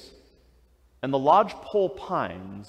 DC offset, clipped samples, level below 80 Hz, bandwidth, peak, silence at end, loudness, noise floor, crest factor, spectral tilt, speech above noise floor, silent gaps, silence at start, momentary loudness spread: under 0.1%; under 0.1%; -60 dBFS; 9.8 kHz; -6 dBFS; 0.05 s; -25 LUFS; -60 dBFS; 20 dB; -7 dB/octave; 35 dB; none; 1.05 s; 11 LU